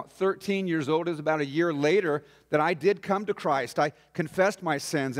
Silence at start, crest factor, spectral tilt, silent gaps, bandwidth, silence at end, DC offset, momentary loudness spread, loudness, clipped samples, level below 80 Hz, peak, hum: 0 s; 16 dB; -5.5 dB/octave; none; 16 kHz; 0 s; under 0.1%; 6 LU; -27 LUFS; under 0.1%; -72 dBFS; -10 dBFS; none